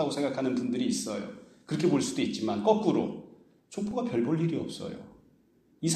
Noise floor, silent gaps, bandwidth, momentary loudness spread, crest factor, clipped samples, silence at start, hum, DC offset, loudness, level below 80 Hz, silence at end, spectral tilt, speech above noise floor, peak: -64 dBFS; none; 14 kHz; 15 LU; 20 dB; under 0.1%; 0 s; none; under 0.1%; -30 LUFS; -68 dBFS; 0 s; -5.5 dB/octave; 35 dB; -10 dBFS